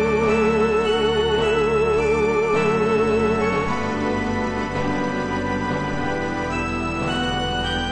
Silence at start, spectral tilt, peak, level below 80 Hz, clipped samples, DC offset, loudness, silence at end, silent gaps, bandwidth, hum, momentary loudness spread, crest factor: 0 s; -5.5 dB/octave; -8 dBFS; -38 dBFS; under 0.1%; under 0.1%; -21 LUFS; 0 s; none; 9.4 kHz; none; 5 LU; 14 dB